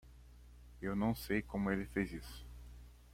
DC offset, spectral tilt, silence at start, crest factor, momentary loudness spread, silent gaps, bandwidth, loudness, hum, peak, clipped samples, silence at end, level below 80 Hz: under 0.1%; -6.5 dB/octave; 0.05 s; 20 dB; 23 LU; none; 16.5 kHz; -39 LUFS; 60 Hz at -50 dBFS; -22 dBFS; under 0.1%; 0 s; -54 dBFS